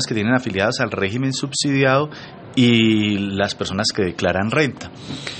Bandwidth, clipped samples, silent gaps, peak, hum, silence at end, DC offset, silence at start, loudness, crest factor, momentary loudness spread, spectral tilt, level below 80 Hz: 8.8 kHz; under 0.1%; none; -2 dBFS; none; 0 s; under 0.1%; 0 s; -19 LUFS; 16 dB; 10 LU; -5 dB/octave; -56 dBFS